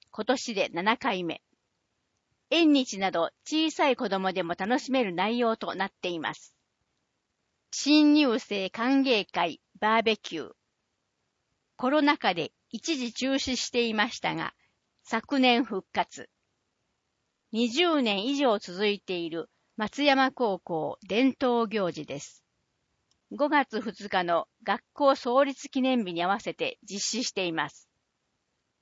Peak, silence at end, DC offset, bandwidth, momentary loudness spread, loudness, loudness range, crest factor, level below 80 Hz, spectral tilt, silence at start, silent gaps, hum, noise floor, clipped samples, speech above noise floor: -8 dBFS; 1.1 s; under 0.1%; 8 kHz; 12 LU; -27 LUFS; 4 LU; 20 dB; -70 dBFS; -3.5 dB/octave; 0.15 s; none; none; -79 dBFS; under 0.1%; 52 dB